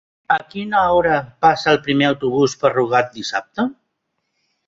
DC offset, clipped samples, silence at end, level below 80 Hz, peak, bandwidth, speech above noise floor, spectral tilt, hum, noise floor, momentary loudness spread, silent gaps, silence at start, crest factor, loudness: under 0.1%; under 0.1%; 0.95 s; -52 dBFS; -2 dBFS; 7.8 kHz; 56 dB; -5 dB/octave; none; -73 dBFS; 9 LU; none; 0.3 s; 16 dB; -18 LUFS